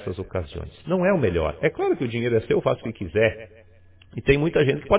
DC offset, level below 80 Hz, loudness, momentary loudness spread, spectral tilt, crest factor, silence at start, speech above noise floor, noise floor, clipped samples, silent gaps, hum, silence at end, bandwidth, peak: under 0.1%; -42 dBFS; -23 LUFS; 11 LU; -11 dB/octave; 20 dB; 0 s; 28 dB; -51 dBFS; under 0.1%; none; none; 0 s; 4 kHz; -4 dBFS